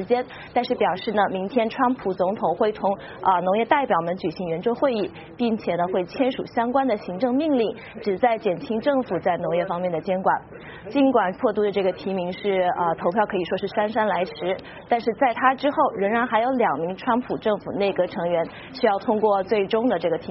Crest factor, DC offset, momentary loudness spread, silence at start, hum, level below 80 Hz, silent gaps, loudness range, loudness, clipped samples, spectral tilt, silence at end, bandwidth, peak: 20 dB; under 0.1%; 6 LU; 0 s; none; -58 dBFS; none; 2 LU; -23 LUFS; under 0.1%; -4 dB/octave; 0 s; 5.8 kHz; -4 dBFS